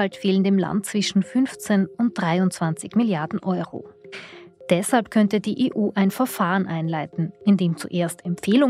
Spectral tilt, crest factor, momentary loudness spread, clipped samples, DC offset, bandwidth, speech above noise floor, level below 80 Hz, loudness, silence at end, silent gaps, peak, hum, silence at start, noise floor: -6 dB/octave; 16 dB; 8 LU; under 0.1%; under 0.1%; 15.5 kHz; 21 dB; -66 dBFS; -22 LUFS; 0 s; none; -6 dBFS; none; 0 s; -43 dBFS